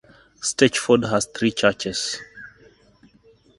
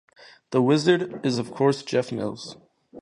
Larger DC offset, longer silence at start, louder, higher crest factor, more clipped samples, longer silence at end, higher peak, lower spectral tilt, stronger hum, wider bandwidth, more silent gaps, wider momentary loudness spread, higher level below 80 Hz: neither; about the same, 0.4 s vs 0.5 s; first, -21 LUFS vs -24 LUFS; first, 24 dB vs 18 dB; neither; first, 1.1 s vs 0 s; first, 0 dBFS vs -6 dBFS; second, -3.5 dB/octave vs -6 dB/octave; neither; about the same, 11.5 kHz vs 11 kHz; neither; about the same, 13 LU vs 12 LU; first, -56 dBFS vs -66 dBFS